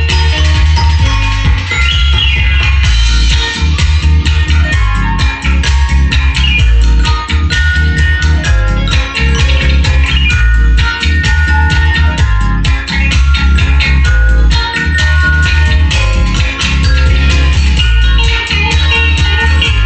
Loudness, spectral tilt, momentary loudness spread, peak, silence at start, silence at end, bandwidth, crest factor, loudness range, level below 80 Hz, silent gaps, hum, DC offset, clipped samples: -10 LUFS; -4.5 dB/octave; 3 LU; 0 dBFS; 0 s; 0 s; 8.6 kHz; 8 dB; 1 LU; -10 dBFS; none; none; under 0.1%; under 0.1%